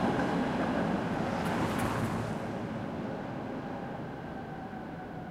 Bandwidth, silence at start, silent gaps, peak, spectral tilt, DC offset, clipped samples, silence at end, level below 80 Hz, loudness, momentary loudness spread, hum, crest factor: 16 kHz; 0 s; none; -16 dBFS; -6.5 dB/octave; under 0.1%; under 0.1%; 0 s; -54 dBFS; -34 LUFS; 10 LU; none; 18 dB